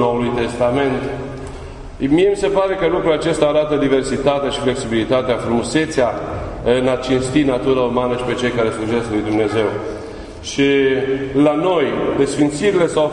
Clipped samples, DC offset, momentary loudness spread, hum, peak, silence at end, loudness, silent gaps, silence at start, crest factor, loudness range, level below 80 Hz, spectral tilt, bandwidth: under 0.1%; under 0.1%; 10 LU; none; -2 dBFS; 0 s; -17 LUFS; none; 0 s; 16 dB; 2 LU; -38 dBFS; -5.5 dB/octave; 11 kHz